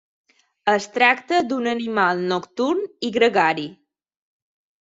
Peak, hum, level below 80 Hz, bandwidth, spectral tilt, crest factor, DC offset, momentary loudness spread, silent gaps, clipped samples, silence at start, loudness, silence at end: -2 dBFS; none; -66 dBFS; 7.8 kHz; -4.5 dB/octave; 20 dB; under 0.1%; 8 LU; none; under 0.1%; 0.65 s; -20 LUFS; 1.05 s